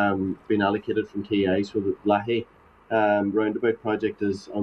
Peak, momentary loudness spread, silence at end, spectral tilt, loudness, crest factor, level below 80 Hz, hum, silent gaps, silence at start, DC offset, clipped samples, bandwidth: -8 dBFS; 6 LU; 0 s; -7.5 dB/octave; -25 LUFS; 16 dB; -60 dBFS; none; none; 0 s; under 0.1%; under 0.1%; 8 kHz